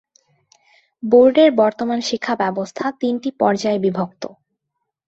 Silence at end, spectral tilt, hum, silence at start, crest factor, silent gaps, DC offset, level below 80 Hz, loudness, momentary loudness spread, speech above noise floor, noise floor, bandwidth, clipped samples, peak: 0.8 s; -5.5 dB/octave; none; 1.05 s; 18 dB; none; under 0.1%; -62 dBFS; -17 LUFS; 14 LU; 61 dB; -77 dBFS; 8 kHz; under 0.1%; -2 dBFS